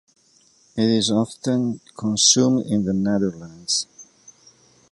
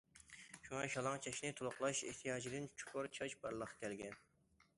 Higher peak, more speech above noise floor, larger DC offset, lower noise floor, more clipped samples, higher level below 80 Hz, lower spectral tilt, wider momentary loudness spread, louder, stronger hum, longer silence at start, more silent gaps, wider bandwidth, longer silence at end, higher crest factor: first, -2 dBFS vs -26 dBFS; first, 37 dB vs 30 dB; neither; second, -58 dBFS vs -76 dBFS; neither; first, -56 dBFS vs -76 dBFS; about the same, -4 dB/octave vs -3.5 dB/octave; about the same, 13 LU vs 14 LU; first, -20 LUFS vs -45 LUFS; neither; first, 0.75 s vs 0.15 s; neither; about the same, 11.5 kHz vs 11.5 kHz; first, 0.9 s vs 0.55 s; about the same, 20 dB vs 20 dB